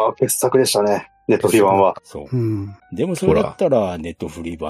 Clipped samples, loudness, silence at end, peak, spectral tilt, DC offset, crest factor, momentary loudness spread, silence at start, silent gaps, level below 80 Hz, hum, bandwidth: under 0.1%; -18 LUFS; 0 s; -2 dBFS; -5 dB/octave; under 0.1%; 16 dB; 14 LU; 0 s; none; -46 dBFS; none; 15 kHz